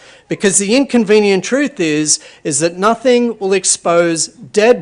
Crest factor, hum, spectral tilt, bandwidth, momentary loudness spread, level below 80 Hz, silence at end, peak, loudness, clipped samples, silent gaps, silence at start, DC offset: 12 dB; none; -3 dB/octave; 11 kHz; 6 LU; -56 dBFS; 0 s; 0 dBFS; -13 LUFS; under 0.1%; none; 0.3 s; under 0.1%